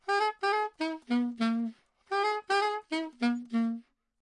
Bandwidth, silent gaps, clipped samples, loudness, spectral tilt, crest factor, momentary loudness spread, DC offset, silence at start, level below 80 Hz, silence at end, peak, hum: 10.5 kHz; none; under 0.1%; -31 LUFS; -4.5 dB/octave; 14 dB; 6 LU; under 0.1%; 0.05 s; -80 dBFS; 0.4 s; -16 dBFS; none